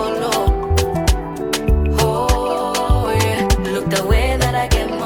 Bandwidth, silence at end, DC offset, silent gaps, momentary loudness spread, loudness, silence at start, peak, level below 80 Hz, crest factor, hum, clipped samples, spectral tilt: 19 kHz; 0 s; under 0.1%; none; 3 LU; -18 LUFS; 0 s; -2 dBFS; -22 dBFS; 14 dB; none; under 0.1%; -5 dB/octave